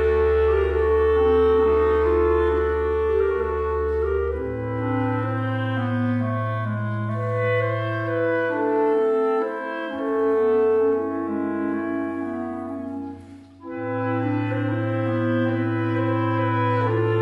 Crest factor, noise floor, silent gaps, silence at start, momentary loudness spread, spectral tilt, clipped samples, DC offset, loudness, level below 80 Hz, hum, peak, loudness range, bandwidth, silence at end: 14 dB; -43 dBFS; none; 0 s; 9 LU; -9.5 dB/octave; under 0.1%; under 0.1%; -22 LUFS; -36 dBFS; none; -8 dBFS; 7 LU; 5.2 kHz; 0 s